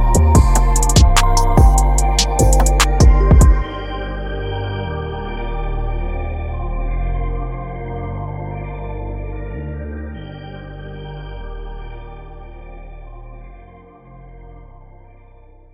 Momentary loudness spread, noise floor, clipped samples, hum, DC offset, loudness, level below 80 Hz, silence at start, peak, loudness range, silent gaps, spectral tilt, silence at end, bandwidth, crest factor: 23 LU; -43 dBFS; under 0.1%; none; under 0.1%; -17 LUFS; -18 dBFS; 0 s; 0 dBFS; 22 LU; none; -5 dB/octave; 1.1 s; 15.5 kHz; 16 dB